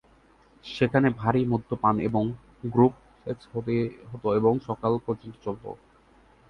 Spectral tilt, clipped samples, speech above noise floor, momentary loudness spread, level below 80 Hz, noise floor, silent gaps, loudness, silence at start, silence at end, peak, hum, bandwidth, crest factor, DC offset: -9 dB/octave; under 0.1%; 33 dB; 15 LU; -56 dBFS; -59 dBFS; none; -26 LUFS; 0.65 s; 0.75 s; -6 dBFS; none; 7 kHz; 20 dB; under 0.1%